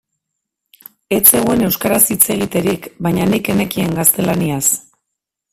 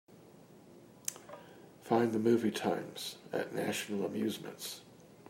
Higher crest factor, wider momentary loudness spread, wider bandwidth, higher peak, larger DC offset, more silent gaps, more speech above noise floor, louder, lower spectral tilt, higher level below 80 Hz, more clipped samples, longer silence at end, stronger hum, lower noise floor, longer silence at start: about the same, 16 dB vs 20 dB; second, 10 LU vs 21 LU; about the same, 16.5 kHz vs 16 kHz; first, 0 dBFS vs -16 dBFS; neither; neither; first, 64 dB vs 23 dB; first, -14 LUFS vs -35 LUFS; about the same, -4 dB/octave vs -4.5 dB/octave; first, -46 dBFS vs -80 dBFS; first, 0.2% vs under 0.1%; first, 0.75 s vs 0 s; neither; first, -78 dBFS vs -57 dBFS; first, 1.1 s vs 0.1 s